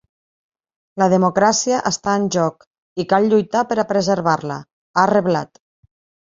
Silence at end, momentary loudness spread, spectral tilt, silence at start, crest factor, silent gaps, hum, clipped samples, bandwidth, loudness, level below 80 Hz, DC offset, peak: 0.85 s; 13 LU; -4.5 dB/octave; 0.95 s; 18 dB; 2.67-2.71 s, 2.78-2.96 s, 4.73-4.94 s; none; under 0.1%; 7.8 kHz; -18 LUFS; -58 dBFS; under 0.1%; -2 dBFS